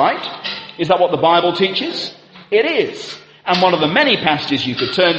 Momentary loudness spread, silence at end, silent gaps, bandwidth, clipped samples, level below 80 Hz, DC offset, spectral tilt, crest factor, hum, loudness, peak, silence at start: 12 LU; 0 s; none; 8.4 kHz; under 0.1%; -58 dBFS; under 0.1%; -5 dB/octave; 16 dB; none; -16 LUFS; 0 dBFS; 0 s